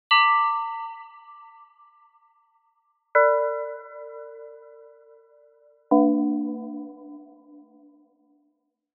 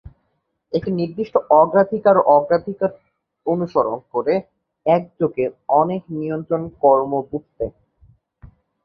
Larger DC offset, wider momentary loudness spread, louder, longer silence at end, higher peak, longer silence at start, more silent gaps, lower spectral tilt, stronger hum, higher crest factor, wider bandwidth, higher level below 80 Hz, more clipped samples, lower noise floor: neither; first, 26 LU vs 12 LU; second, -22 LUFS vs -19 LUFS; first, 1.7 s vs 0.4 s; second, -6 dBFS vs 0 dBFS; second, 0.1 s vs 0.7 s; neither; second, -0.5 dB/octave vs -10 dB/octave; neither; about the same, 22 dB vs 20 dB; second, 4.6 kHz vs 5.6 kHz; second, -88 dBFS vs -52 dBFS; neither; about the same, -73 dBFS vs -71 dBFS